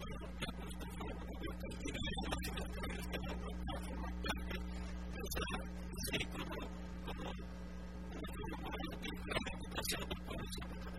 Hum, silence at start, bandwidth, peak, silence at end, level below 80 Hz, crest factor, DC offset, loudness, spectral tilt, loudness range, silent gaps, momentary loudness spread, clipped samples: none; 0 s; 16 kHz; -24 dBFS; 0 s; -48 dBFS; 20 dB; 0.2%; -44 LUFS; -4.5 dB/octave; 2 LU; none; 7 LU; under 0.1%